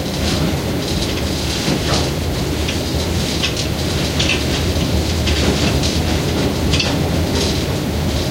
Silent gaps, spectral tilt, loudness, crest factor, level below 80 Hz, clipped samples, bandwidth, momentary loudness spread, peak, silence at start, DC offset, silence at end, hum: none; -4.5 dB/octave; -18 LUFS; 16 dB; -26 dBFS; under 0.1%; 16 kHz; 3 LU; -2 dBFS; 0 s; under 0.1%; 0 s; none